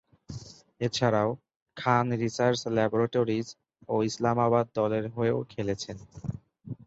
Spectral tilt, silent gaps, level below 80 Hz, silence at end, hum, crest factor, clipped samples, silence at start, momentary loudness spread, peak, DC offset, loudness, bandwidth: -6 dB/octave; 1.56-1.66 s; -60 dBFS; 0.1 s; none; 20 dB; under 0.1%; 0.3 s; 18 LU; -8 dBFS; under 0.1%; -28 LUFS; 8 kHz